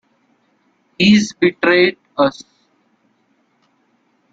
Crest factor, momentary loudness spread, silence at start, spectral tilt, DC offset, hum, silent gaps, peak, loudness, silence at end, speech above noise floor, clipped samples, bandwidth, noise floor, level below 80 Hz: 18 dB; 6 LU; 1 s; -5 dB/octave; under 0.1%; none; none; -2 dBFS; -15 LUFS; 2 s; 48 dB; under 0.1%; 7.8 kHz; -62 dBFS; -56 dBFS